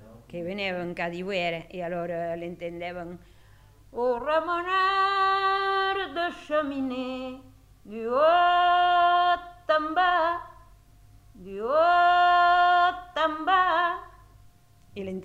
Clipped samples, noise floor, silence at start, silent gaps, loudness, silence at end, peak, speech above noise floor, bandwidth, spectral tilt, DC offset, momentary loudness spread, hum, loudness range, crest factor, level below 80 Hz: under 0.1%; -55 dBFS; 0.05 s; none; -24 LUFS; 0 s; -10 dBFS; 29 dB; 8.2 kHz; -5 dB/octave; under 0.1%; 16 LU; none; 9 LU; 16 dB; -58 dBFS